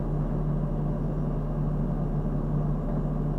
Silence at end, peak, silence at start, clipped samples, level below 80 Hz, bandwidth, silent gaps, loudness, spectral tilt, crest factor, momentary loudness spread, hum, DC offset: 0 s; -16 dBFS; 0 s; under 0.1%; -32 dBFS; 3.1 kHz; none; -29 LUFS; -11 dB/octave; 10 dB; 1 LU; none; under 0.1%